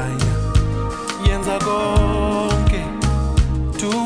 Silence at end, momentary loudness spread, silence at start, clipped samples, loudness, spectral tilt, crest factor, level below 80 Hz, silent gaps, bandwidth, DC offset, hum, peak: 0 s; 4 LU; 0 s; under 0.1%; -20 LUFS; -6 dB/octave; 12 dB; -22 dBFS; none; 10.5 kHz; under 0.1%; none; -6 dBFS